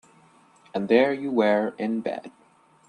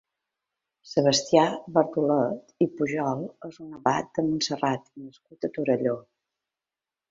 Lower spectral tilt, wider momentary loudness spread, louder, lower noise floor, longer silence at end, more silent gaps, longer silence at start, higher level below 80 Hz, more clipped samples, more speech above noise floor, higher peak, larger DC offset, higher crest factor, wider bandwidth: first, -7 dB/octave vs -4.5 dB/octave; second, 13 LU vs 16 LU; about the same, -24 LUFS vs -26 LUFS; second, -57 dBFS vs under -90 dBFS; second, 0.6 s vs 1.1 s; neither; about the same, 0.75 s vs 0.85 s; about the same, -72 dBFS vs -68 dBFS; neither; second, 33 dB vs over 64 dB; about the same, -6 dBFS vs -4 dBFS; neither; about the same, 20 dB vs 22 dB; first, 10 kHz vs 7.8 kHz